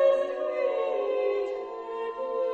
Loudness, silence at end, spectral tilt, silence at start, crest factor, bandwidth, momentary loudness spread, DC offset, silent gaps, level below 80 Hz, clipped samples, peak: -29 LUFS; 0 s; -4 dB/octave; 0 s; 16 dB; 7.2 kHz; 7 LU; under 0.1%; none; -70 dBFS; under 0.1%; -12 dBFS